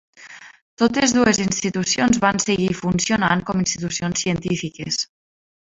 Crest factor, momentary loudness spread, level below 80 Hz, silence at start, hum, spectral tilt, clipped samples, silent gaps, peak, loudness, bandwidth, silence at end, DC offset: 18 dB; 8 LU; -48 dBFS; 0.2 s; none; -4 dB/octave; under 0.1%; 0.61-0.77 s; -2 dBFS; -20 LUFS; 8 kHz; 0.75 s; under 0.1%